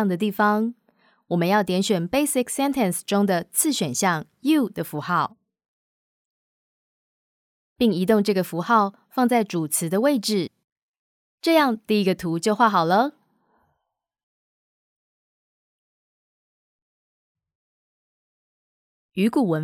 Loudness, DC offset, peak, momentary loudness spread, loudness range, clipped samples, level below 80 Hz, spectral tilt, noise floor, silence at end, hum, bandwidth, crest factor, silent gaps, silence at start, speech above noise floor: -22 LUFS; under 0.1%; -4 dBFS; 7 LU; 7 LU; under 0.1%; -64 dBFS; -4.5 dB/octave; -79 dBFS; 0 s; none; 19.5 kHz; 20 dB; 5.68-7.76 s, 10.64-11.38 s, 14.23-17.35 s, 17.55-19.09 s; 0 s; 58 dB